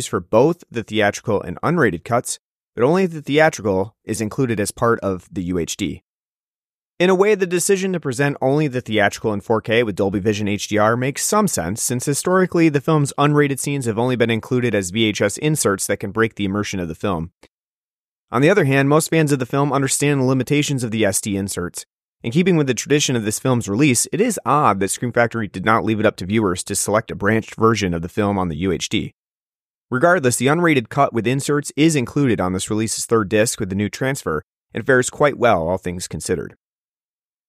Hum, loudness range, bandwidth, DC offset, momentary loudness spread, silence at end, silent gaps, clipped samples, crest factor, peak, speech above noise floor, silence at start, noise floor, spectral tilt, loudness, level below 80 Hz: none; 3 LU; 15.5 kHz; under 0.1%; 8 LU; 1 s; 2.39-2.73 s, 6.02-6.97 s, 17.34-17.41 s, 17.50-18.28 s, 21.86-22.19 s, 29.14-29.89 s, 34.44-34.61 s; under 0.1%; 18 dB; -2 dBFS; over 72 dB; 0 s; under -90 dBFS; -5 dB/octave; -19 LUFS; -50 dBFS